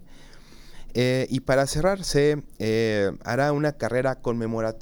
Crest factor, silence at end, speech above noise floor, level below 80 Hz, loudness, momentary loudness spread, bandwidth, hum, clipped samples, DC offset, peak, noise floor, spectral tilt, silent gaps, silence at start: 16 dB; 0 s; 21 dB; -42 dBFS; -24 LUFS; 5 LU; 18 kHz; none; under 0.1%; under 0.1%; -8 dBFS; -45 dBFS; -5.5 dB/octave; none; 0 s